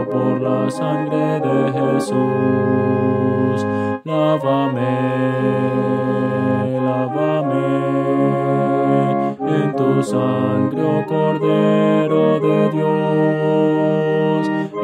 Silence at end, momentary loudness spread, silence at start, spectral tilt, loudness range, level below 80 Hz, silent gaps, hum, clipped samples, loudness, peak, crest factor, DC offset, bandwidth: 0 s; 4 LU; 0 s; -8 dB/octave; 2 LU; -62 dBFS; none; none; under 0.1%; -17 LUFS; -4 dBFS; 14 dB; under 0.1%; 11 kHz